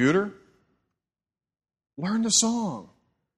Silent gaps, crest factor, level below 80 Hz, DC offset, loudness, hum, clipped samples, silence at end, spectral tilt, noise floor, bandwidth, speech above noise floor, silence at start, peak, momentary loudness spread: none; 20 dB; -66 dBFS; under 0.1%; -25 LUFS; none; under 0.1%; 0.55 s; -3 dB/octave; under -90 dBFS; 13 kHz; over 66 dB; 0 s; -10 dBFS; 14 LU